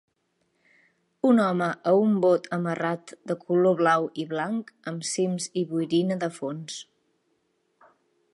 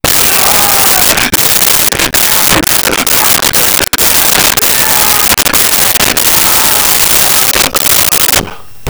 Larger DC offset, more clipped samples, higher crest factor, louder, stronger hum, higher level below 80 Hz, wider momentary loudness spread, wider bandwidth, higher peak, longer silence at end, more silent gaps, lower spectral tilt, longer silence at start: neither; neither; first, 18 dB vs 8 dB; second, -25 LUFS vs -5 LUFS; neither; second, -78 dBFS vs -30 dBFS; first, 13 LU vs 2 LU; second, 11.5 kHz vs over 20 kHz; second, -8 dBFS vs 0 dBFS; first, 1.5 s vs 0 s; neither; first, -5.5 dB/octave vs -0.5 dB/octave; first, 1.25 s vs 0.05 s